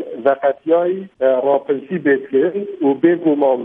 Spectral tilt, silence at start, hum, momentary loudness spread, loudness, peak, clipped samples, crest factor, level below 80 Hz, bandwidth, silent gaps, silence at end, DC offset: -10 dB/octave; 0 s; none; 5 LU; -17 LUFS; -2 dBFS; under 0.1%; 16 dB; -68 dBFS; 3.8 kHz; none; 0 s; under 0.1%